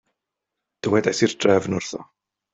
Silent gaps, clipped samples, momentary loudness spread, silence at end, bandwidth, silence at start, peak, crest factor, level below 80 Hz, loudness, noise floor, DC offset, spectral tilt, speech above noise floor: none; under 0.1%; 13 LU; 0.5 s; 8.2 kHz; 0.85 s; -4 dBFS; 20 dB; -62 dBFS; -21 LUFS; -83 dBFS; under 0.1%; -5 dB/octave; 62 dB